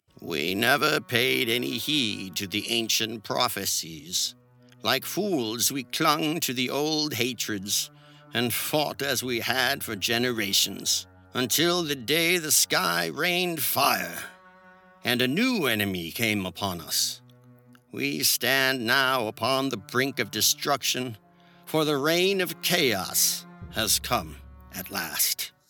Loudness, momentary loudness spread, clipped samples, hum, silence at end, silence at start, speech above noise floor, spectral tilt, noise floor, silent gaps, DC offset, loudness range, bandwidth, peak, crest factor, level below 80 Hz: -25 LUFS; 8 LU; under 0.1%; none; 0.2 s; 0.2 s; 28 dB; -2 dB/octave; -54 dBFS; none; under 0.1%; 3 LU; 19 kHz; -4 dBFS; 24 dB; -58 dBFS